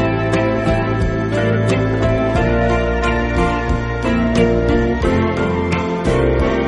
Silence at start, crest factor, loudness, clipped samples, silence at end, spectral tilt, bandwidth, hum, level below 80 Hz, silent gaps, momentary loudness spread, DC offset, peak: 0 s; 14 dB; -17 LUFS; under 0.1%; 0 s; -7 dB/octave; 11 kHz; none; -24 dBFS; none; 3 LU; under 0.1%; -2 dBFS